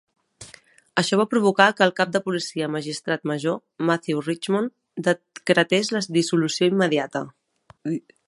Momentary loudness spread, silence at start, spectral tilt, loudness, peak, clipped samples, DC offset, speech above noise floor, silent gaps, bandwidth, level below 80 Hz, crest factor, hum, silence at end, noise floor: 12 LU; 0.4 s; -4.5 dB/octave; -22 LUFS; 0 dBFS; under 0.1%; under 0.1%; 29 dB; none; 11.5 kHz; -70 dBFS; 22 dB; none; 0.3 s; -51 dBFS